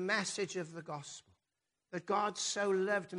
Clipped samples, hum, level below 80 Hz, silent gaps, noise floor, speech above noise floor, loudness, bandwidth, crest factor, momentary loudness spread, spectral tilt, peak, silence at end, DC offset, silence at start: under 0.1%; none; -82 dBFS; none; -88 dBFS; 52 dB; -36 LUFS; 10.5 kHz; 16 dB; 13 LU; -3 dB/octave; -20 dBFS; 0 s; under 0.1%; 0 s